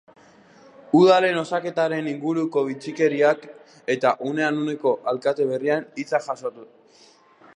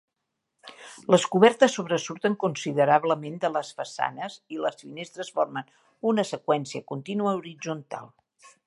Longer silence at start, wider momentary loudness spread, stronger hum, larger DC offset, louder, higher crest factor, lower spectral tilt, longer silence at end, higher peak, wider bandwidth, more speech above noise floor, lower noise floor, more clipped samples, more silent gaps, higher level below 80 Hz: first, 0.95 s vs 0.65 s; second, 11 LU vs 17 LU; neither; neither; first, -22 LUFS vs -26 LUFS; second, 18 dB vs 24 dB; about the same, -6 dB/octave vs -5 dB/octave; first, 0.9 s vs 0.2 s; about the same, -4 dBFS vs -4 dBFS; second, 10 kHz vs 11.5 kHz; second, 32 dB vs 56 dB; second, -54 dBFS vs -82 dBFS; neither; neither; about the same, -76 dBFS vs -78 dBFS